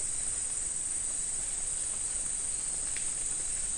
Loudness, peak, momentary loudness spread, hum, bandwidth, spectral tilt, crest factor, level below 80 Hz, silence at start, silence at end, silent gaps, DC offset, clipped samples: -31 LUFS; -20 dBFS; 0 LU; none; 12 kHz; 0 dB/octave; 14 dB; -50 dBFS; 0 s; 0 s; none; 0.2%; under 0.1%